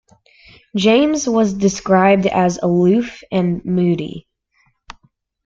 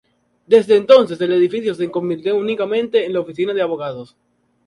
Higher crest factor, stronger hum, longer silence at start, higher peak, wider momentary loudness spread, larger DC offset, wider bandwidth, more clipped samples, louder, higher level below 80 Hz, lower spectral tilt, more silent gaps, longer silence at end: about the same, 16 dB vs 16 dB; neither; first, 0.75 s vs 0.5 s; about the same, -2 dBFS vs 0 dBFS; about the same, 9 LU vs 10 LU; neither; second, 7.6 kHz vs 11 kHz; neither; about the same, -16 LUFS vs -17 LUFS; first, -50 dBFS vs -64 dBFS; about the same, -6 dB/octave vs -6.5 dB/octave; neither; about the same, 0.55 s vs 0.6 s